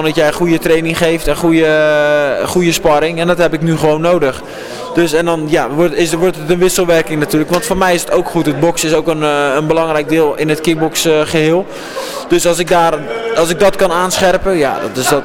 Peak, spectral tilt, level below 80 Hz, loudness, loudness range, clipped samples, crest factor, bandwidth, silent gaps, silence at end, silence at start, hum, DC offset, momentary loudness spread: 0 dBFS; -4.5 dB/octave; -34 dBFS; -12 LUFS; 2 LU; under 0.1%; 12 dB; 17 kHz; none; 0 s; 0 s; none; under 0.1%; 4 LU